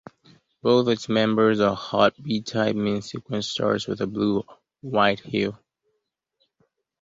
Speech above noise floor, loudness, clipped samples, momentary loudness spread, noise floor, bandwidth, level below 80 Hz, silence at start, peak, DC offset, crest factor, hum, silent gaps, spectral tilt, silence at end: 55 dB; -23 LUFS; under 0.1%; 9 LU; -78 dBFS; 7.8 kHz; -60 dBFS; 0.65 s; -4 dBFS; under 0.1%; 20 dB; none; none; -5.5 dB/octave; 1.45 s